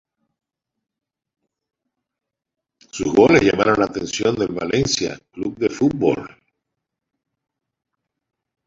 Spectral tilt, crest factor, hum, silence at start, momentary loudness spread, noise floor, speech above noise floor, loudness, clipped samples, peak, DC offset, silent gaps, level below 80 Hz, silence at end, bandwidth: -4.5 dB/octave; 22 dB; none; 2.95 s; 14 LU; -84 dBFS; 66 dB; -19 LUFS; under 0.1%; 0 dBFS; under 0.1%; none; -50 dBFS; 2.4 s; 7.8 kHz